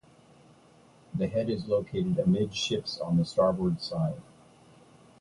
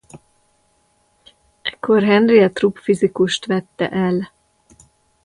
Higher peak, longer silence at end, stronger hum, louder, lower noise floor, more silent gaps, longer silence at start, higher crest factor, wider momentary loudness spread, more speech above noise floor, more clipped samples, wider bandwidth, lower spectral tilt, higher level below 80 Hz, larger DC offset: second, -12 dBFS vs -2 dBFS; about the same, 1 s vs 1 s; neither; second, -29 LUFS vs -17 LUFS; about the same, -58 dBFS vs -61 dBFS; neither; first, 1.1 s vs 0.15 s; about the same, 18 dB vs 18 dB; second, 7 LU vs 13 LU; second, 30 dB vs 45 dB; neither; about the same, 11 kHz vs 11.5 kHz; about the same, -6.5 dB/octave vs -6 dB/octave; about the same, -56 dBFS vs -58 dBFS; neither